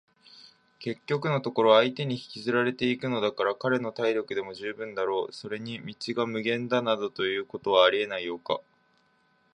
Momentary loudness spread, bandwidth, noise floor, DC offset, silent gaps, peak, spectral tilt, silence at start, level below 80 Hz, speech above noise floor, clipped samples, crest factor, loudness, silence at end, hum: 14 LU; 10 kHz; -67 dBFS; under 0.1%; none; -6 dBFS; -6 dB/octave; 0.35 s; -72 dBFS; 40 dB; under 0.1%; 22 dB; -28 LUFS; 0.95 s; none